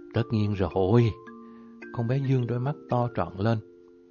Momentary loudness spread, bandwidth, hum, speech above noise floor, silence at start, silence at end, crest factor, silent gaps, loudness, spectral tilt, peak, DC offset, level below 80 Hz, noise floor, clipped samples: 21 LU; 6.8 kHz; none; 21 dB; 0 s; 0.5 s; 18 dB; none; -27 LUFS; -9.5 dB/octave; -10 dBFS; under 0.1%; -48 dBFS; -46 dBFS; under 0.1%